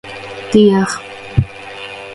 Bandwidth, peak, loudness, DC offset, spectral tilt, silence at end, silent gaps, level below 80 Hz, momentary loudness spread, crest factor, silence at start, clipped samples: 11.5 kHz; 0 dBFS; -15 LUFS; under 0.1%; -6 dB/octave; 0 s; none; -36 dBFS; 17 LU; 16 dB; 0.05 s; under 0.1%